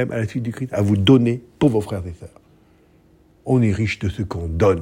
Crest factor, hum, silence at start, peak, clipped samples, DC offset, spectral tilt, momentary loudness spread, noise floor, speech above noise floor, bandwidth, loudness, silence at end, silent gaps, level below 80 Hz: 18 dB; none; 0 s; -2 dBFS; under 0.1%; under 0.1%; -7.5 dB/octave; 14 LU; -54 dBFS; 35 dB; 15.5 kHz; -20 LUFS; 0 s; none; -44 dBFS